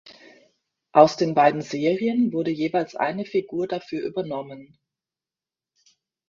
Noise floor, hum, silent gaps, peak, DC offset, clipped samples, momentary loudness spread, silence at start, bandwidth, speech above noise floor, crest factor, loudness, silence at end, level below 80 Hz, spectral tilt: under -90 dBFS; none; none; 0 dBFS; under 0.1%; under 0.1%; 13 LU; 0.05 s; 7.4 kHz; over 68 dB; 24 dB; -23 LUFS; 1.65 s; -68 dBFS; -6.5 dB/octave